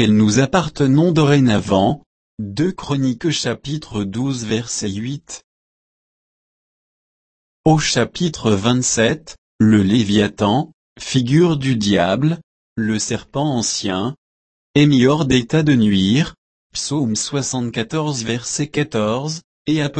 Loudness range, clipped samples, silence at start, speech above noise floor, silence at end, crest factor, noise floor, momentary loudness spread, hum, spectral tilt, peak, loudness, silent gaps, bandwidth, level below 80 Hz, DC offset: 7 LU; under 0.1%; 0 s; over 73 dB; 0 s; 16 dB; under -90 dBFS; 11 LU; none; -5 dB/octave; -2 dBFS; -18 LUFS; 2.06-2.38 s, 5.44-7.64 s, 9.38-9.59 s, 10.73-10.96 s, 12.43-12.76 s, 14.18-14.74 s, 16.38-16.70 s, 19.44-19.65 s; 8.8 kHz; -46 dBFS; under 0.1%